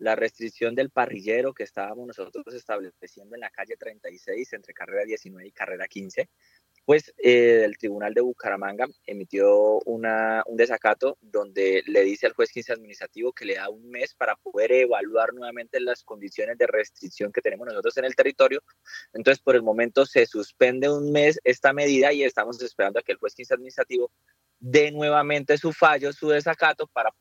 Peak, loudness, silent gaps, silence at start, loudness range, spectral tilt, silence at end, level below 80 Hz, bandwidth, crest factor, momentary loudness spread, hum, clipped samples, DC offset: -4 dBFS; -23 LUFS; none; 0 s; 12 LU; -4.5 dB/octave; 0.1 s; -80 dBFS; 8 kHz; 20 dB; 15 LU; none; under 0.1%; under 0.1%